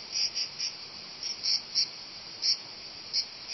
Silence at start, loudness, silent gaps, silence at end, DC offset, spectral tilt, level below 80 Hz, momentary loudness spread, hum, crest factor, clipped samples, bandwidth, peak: 0 s; -30 LUFS; none; 0 s; under 0.1%; 1 dB/octave; -72 dBFS; 13 LU; none; 20 dB; under 0.1%; 6.2 kHz; -14 dBFS